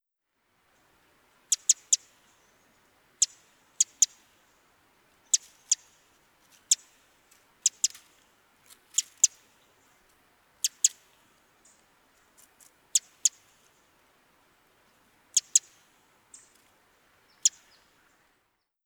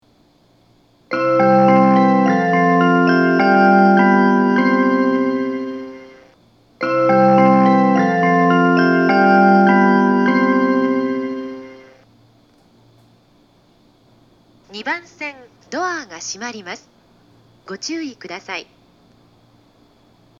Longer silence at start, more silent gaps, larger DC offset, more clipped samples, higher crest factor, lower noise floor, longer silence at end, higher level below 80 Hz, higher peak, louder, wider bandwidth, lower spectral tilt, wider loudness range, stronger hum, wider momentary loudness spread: first, 1.5 s vs 1.1 s; neither; neither; neither; first, 28 dB vs 16 dB; first, -78 dBFS vs -55 dBFS; second, 1.35 s vs 1.75 s; second, -82 dBFS vs -66 dBFS; second, -6 dBFS vs 0 dBFS; second, -26 LUFS vs -14 LUFS; first, over 20 kHz vs 7.4 kHz; second, 4.5 dB/octave vs -6.5 dB/octave; second, 5 LU vs 19 LU; neither; second, 6 LU vs 18 LU